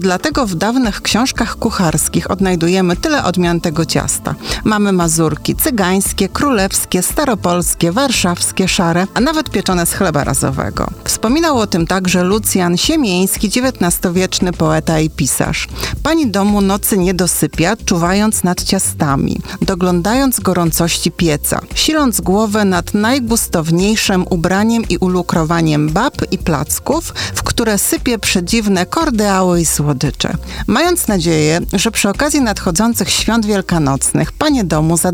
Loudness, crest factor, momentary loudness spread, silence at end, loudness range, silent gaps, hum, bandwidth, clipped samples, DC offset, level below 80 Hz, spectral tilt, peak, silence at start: -14 LUFS; 12 dB; 4 LU; 0 s; 1 LU; none; none; over 20 kHz; under 0.1%; under 0.1%; -30 dBFS; -4 dB/octave; -2 dBFS; 0 s